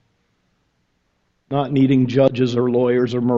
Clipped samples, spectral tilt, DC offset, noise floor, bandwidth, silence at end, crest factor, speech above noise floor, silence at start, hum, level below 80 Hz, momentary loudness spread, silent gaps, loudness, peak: under 0.1%; -8.5 dB/octave; under 0.1%; -67 dBFS; 7.2 kHz; 0 s; 18 dB; 51 dB; 1.5 s; none; -56 dBFS; 6 LU; none; -18 LUFS; -2 dBFS